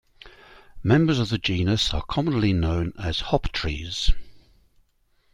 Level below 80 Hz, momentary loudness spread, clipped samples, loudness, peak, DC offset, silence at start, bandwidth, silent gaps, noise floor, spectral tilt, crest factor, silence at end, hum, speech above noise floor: -32 dBFS; 8 LU; under 0.1%; -24 LUFS; -4 dBFS; under 0.1%; 0.25 s; 11 kHz; none; -65 dBFS; -6 dB/octave; 20 dB; 0.95 s; none; 43 dB